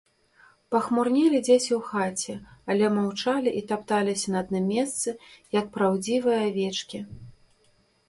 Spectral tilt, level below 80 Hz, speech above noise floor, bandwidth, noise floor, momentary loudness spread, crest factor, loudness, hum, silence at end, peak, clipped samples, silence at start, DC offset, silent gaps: -4.5 dB/octave; -64 dBFS; 39 dB; 11.5 kHz; -64 dBFS; 11 LU; 18 dB; -25 LUFS; none; 0.75 s; -8 dBFS; under 0.1%; 0.7 s; under 0.1%; none